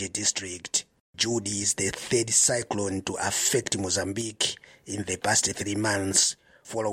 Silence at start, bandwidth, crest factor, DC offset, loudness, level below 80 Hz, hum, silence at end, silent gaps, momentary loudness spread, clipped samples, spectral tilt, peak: 0 s; 16.5 kHz; 20 dB; under 0.1%; -25 LUFS; -60 dBFS; none; 0 s; 1.00-1.13 s; 10 LU; under 0.1%; -2 dB/octave; -8 dBFS